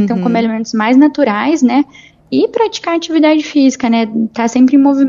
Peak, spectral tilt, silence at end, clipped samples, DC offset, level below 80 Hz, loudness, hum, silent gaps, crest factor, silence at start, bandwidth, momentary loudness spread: 0 dBFS; -5.5 dB/octave; 0 s; under 0.1%; under 0.1%; -56 dBFS; -12 LUFS; none; none; 12 dB; 0 s; 7.4 kHz; 7 LU